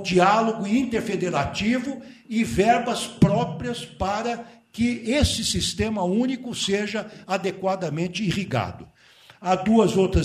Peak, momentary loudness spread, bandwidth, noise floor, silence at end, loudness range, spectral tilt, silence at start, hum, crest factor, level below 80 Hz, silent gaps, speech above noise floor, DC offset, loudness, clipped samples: -6 dBFS; 11 LU; 14.5 kHz; -51 dBFS; 0 s; 3 LU; -5 dB/octave; 0 s; none; 18 dB; -40 dBFS; none; 29 dB; under 0.1%; -23 LUFS; under 0.1%